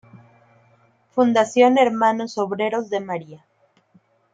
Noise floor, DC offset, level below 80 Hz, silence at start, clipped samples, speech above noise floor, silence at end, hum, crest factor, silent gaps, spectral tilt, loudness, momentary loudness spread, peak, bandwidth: -59 dBFS; under 0.1%; -72 dBFS; 0.15 s; under 0.1%; 40 dB; 0.95 s; none; 18 dB; none; -5 dB/octave; -20 LUFS; 12 LU; -4 dBFS; 9.2 kHz